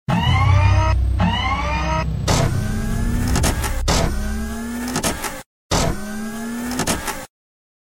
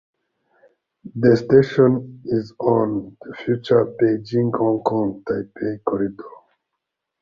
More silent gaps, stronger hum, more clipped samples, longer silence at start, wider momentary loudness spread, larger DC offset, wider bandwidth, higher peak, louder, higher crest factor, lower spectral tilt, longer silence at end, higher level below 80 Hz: first, 5.46-5.70 s vs none; neither; neither; second, 0.1 s vs 1.05 s; about the same, 11 LU vs 12 LU; neither; first, 17 kHz vs 7.2 kHz; about the same, -4 dBFS vs -2 dBFS; about the same, -20 LUFS vs -20 LUFS; about the same, 16 dB vs 18 dB; second, -4.5 dB/octave vs -9 dB/octave; second, 0.55 s vs 0.9 s; first, -24 dBFS vs -56 dBFS